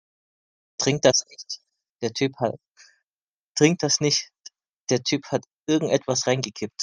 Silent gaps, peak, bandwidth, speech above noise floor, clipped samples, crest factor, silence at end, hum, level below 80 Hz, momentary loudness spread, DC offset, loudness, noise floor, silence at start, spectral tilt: 1.91-1.95 s, 2.70-2.75 s, 3.06-3.17 s, 3.23-3.27 s, 3.33-3.55 s, 4.73-4.85 s, 5.53-5.63 s; -2 dBFS; 11 kHz; over 67 dB; under 0.1%; 22 dB; 0 s; none; -64 dBFS; 16 LU; under 0.1%; -23 LUFS; under -90 dBFS; 0.8 s; -3.5 dB/octave